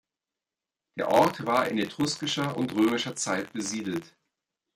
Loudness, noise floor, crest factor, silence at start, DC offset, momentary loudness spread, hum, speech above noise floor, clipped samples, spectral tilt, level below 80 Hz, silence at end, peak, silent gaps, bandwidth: -27 LUFS; -90 dBFS; 22 dB; 0.95 s; under 0.1%; 10 LU; none; 63 dB; under 0.1%; -4 dB/octave; -68 dBFS; 0.7 s; -8 dBFS; none; 16.5 kHz